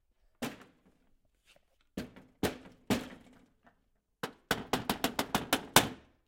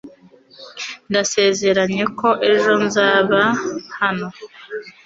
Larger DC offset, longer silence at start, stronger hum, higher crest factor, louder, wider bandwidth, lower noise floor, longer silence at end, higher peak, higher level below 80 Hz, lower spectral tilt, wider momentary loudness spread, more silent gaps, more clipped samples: neither; first, 0.4 s vs 0.05 s; neither; first, 32 dB vs 16 dB; second, -33 LUFS vs -17 LUFS; first, 17 kHz vs 7.8 kHz; first, -75 dBFS vs -47 dBFS; first, 0.3 s vs 0.15 s; about the same, -4 dBFS vs -2 dBFS; about the same, -60 dBFS vs -60 dBFS; about the same, -3 dB/octave vs -3.5 dB/octave; first, 21 LU vs 17 LU; neither; neither